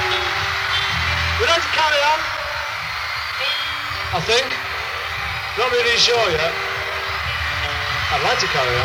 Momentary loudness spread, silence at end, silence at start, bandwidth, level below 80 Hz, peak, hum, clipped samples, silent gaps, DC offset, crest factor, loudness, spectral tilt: 8 LU; 0 s; 0 s; 16.5 kHz; -38 dBFS; -4 dBFS; none; under 0.1%; none; under 0.1%; 16 dB; -19 LUFS; -2.5 dB/octave